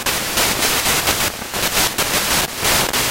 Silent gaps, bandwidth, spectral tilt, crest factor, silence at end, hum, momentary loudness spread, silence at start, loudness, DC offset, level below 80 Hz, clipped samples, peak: none; 17 kHz; -1 dB/octave; 16 dB; 0 s; none; 3 LU; 0 s; -16 LUFS; under 0.1%; -36 dBFS; under 0.1%; -2 dBFS